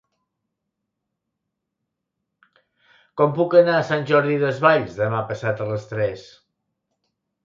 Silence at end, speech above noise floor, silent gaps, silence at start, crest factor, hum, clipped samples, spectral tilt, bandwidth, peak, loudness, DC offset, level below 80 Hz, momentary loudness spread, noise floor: 1.25 s; 61 dB; none; 3.15 s; 22 dB; none; under 0.1%; -7 dB/octave; 7.4 kHz; -2 dBFS; -20 LUFS; under 0.1%; -62 dBFS; 11 LU; -80 dBFS